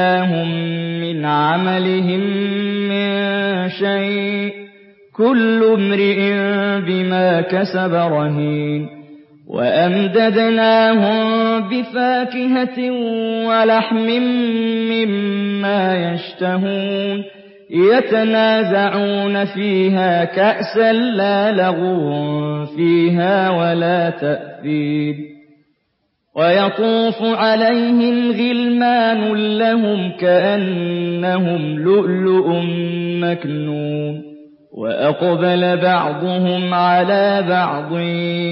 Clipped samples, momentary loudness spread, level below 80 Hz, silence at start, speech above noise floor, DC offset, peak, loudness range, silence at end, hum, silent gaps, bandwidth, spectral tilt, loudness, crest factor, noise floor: under 0.1%; 8 LU; -68 dBFS; 0 s; 52 dB; under 0.1%; -2 dBFS; 3 LU; 0 s; none; none; 5.8 kHz; -11.5 dB/octave; -16 LUFS; 14 dB; -68 dBFS